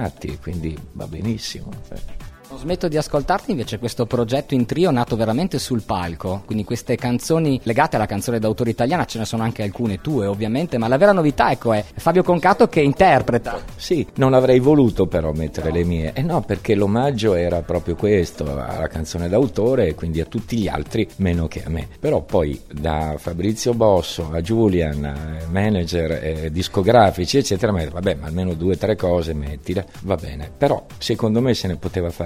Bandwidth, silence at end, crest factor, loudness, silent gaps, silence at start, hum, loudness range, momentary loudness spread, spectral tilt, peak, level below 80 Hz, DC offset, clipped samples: 16 kHz; 0 s; 18 dB; -20 LUFS; none; 0 s; none; 6 LU; 11 LU; -6.5 dB/octave; 0 dBFS; -36 dBFS; under 0.1%; under 0.1%